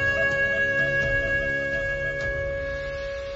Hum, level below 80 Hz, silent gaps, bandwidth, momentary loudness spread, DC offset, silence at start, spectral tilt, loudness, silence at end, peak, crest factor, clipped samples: none; -40 dBFS; none; 8 kHz; 9 LU; under 0.1%; 0 s; -5 dB/octave; -24 LUFS; 0 s; -14 dBFS; 12 dB; under 0.1%